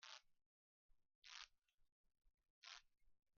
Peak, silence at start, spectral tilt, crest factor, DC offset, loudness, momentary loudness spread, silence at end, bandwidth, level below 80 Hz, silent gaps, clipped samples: -40 dBFS; 0 s; 5 dB/octave; 28 dB; under 0.1%; -62 LUFS; 6 LU; 0.05 s; 7 kHz; -86 dBFS; 0.46-0.89 s, 1.15-1.22 s, 1.74-1.78 s, 1.92-2.04 s, 2.50-2.62 s; under 0.1%